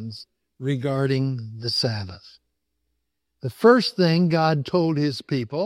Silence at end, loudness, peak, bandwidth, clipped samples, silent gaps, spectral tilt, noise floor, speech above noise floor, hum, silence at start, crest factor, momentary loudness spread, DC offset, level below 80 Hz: 0 s; -22 LUFS; -6 dBFS; 14.5 kHz; under 0.1%; none; -6.5 dB/octave; -78 dBFS; 56 dB; none; 0 s; 18 dB; 17 LU; under 0.1%; -64 dBFS